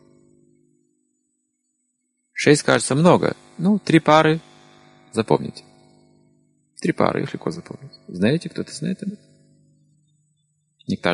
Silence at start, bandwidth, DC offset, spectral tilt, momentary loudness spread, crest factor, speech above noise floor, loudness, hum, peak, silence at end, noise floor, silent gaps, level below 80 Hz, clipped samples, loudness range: 2.35 s; 11.5 kHz; under 0.1%; -5.5 dB/octave; 19 LU; 22 dB; 54 dB; -20 LUFS; none; 0 dBFS; 0 s; -73 dBFS; none; -58 dBFS; under 0.1%; 9 LU